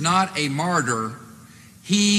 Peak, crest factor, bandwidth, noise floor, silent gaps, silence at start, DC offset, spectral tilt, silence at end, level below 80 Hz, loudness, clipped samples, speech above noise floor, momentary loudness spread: -6 dBFS; 18 dB; 14.5 kHz; -46 dBFS; none; 0 s; under 0.1%; -3.5 dB/octave; 0 s; -64 dBFS; -22 LUFS; under 0.1%; 26 dB; 17 LU